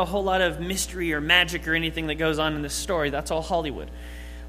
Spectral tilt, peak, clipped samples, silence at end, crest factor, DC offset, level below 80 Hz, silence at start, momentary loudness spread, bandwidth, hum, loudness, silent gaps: -3.5 dB/octave; -4 dBFS; under 0.1%; 0 s; 22 dB; under 0.1%; -38 dBFS; 0 s; 14 LU; 15.5 kHz; 60 Hz at -40 dBFS; -24 LUFS; none